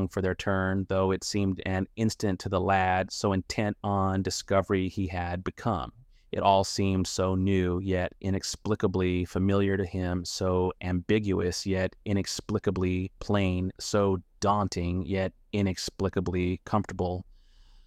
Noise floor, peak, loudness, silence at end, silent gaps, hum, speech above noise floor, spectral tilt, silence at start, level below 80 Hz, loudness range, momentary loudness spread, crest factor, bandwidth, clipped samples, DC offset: -55 dBFS; -8 dBFS; -29 LUFS; 0.65 s; none; none; 27 dB; -5.5 dB/octave; 0 s; -50 dBFS; 1 LU; 5 LU; 20 dB; 14 kHz; under 0.1%; under 0.1%